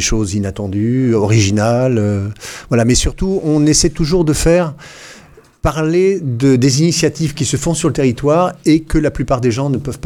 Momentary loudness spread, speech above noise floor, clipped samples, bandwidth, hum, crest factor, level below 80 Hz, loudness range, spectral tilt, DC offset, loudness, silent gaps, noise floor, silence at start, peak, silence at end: 8 LU; 28 dB; under 0.1%; 17 kHz; none; 14 dB; -28 dBFS; 1 LU; -5.5 dB/octave; under 0.1%; -14 LUFS; none; -42 dBFS; 0 s; 0 dBFS; 0.1 s